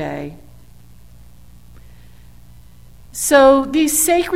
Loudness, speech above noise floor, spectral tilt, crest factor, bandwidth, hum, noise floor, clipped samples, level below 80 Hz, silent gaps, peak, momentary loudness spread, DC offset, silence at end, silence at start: -13 LUFS; 30 dB; -3 dB/octave; 18 dB; 16.5 kHz; none; -45 dBFS; under 0.1%; -44 dBFS; none; 0 dBFS; 21 LU; 0.7%; 0 s; 0 s